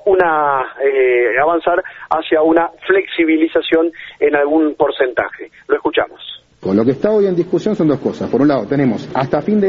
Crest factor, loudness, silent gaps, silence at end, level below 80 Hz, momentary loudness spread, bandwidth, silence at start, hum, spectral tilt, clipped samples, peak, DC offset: 14 dB; -15 LUFS; none; 0 s; -52 dBFS; 7 LU; 7.2 kHz; 0.05 s; none; -4.5 dB/octave; under 0.1%; 0 dBFS; under 0.1%